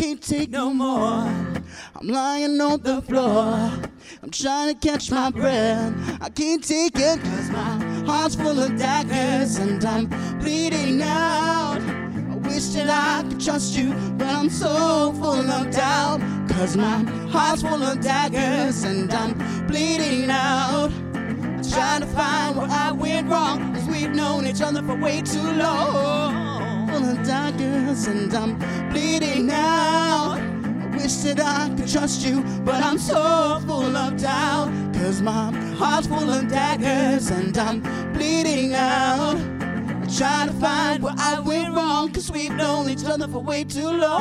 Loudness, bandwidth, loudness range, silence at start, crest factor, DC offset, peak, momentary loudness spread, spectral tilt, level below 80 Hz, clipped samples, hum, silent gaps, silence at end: -22 LUFS; 14.5 kHz; 1 LU; 0 s; 16 dB; under 0.1%; -6 dBFS; 6 LU; -4.5 dB/octave; -44 dBFS; under 0.1%; none; none; 0 s